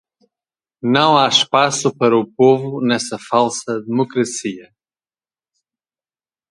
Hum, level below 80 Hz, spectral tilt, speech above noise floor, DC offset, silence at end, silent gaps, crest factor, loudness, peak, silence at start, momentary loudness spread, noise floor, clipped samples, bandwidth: none; -64 dBFS; -4 dB/octave; over 74 dB; under 0.1%; 1.9 s; none; 18 dB; -16 LUFS; 0 dBFS; 0.85 s; 11 LU; under -90 dBFS; under 0.1%; 11.5 kHz